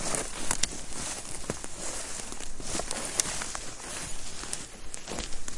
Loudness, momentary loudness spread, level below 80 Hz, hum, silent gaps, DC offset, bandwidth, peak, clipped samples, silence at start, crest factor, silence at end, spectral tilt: -34 LUFS; 9 LU; -44 dBFS; none; none; under 0.1%; 11.5 kHz; -4 dBFS; under 0.1%; 0 s; 26 dB; 0 s; -1.5 dB/octave